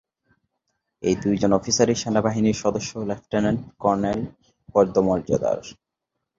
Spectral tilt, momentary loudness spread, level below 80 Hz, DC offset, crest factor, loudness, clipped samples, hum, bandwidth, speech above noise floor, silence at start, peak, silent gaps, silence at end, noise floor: -5 dB/octave; 9 LU; -50 dBFS; under 0.1%; 20 dB; -23 LUFS; under 0.1%; none; 7.8 kHz; 60 dB; 1 s; -4 dBFS; none; 0.65 s; -81 dBFS